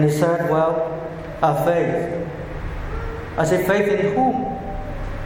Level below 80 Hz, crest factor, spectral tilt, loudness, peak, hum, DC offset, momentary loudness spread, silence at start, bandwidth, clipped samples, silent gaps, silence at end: -34 dBFS; 18 dB; -7 dB/octave; -21 LUFS; -2 dBFS; none; under 0.1%; 12 LU; 0 s; 17 kHz; under 0.1%; none; 0 s